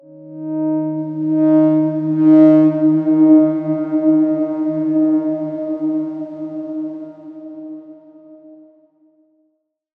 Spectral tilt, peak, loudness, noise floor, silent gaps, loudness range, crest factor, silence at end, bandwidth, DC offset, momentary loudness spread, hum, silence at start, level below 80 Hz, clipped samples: -11.5 dB/octave; -2 dBFS; -15 LUFS; -67 dBFS; none; 18 LU; 16 dB; 1.45 s; 2.8 kHz; under 0.1%; 22 LU; none; 0.15 s; -76 dBFS; under 0.1%